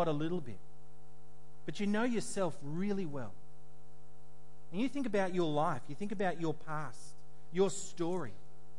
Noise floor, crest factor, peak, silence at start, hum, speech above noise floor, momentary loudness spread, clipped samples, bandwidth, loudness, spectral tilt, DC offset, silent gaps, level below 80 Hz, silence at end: -62 dBFS; 18 dB; -20 dBFS; 0 s; none; 26 dB; 15 LU; under 0.1%; 11.5 kHz; -37 LUFS; -5.5 dB/octave; 2%; none; -72 dBFS; 0.4 s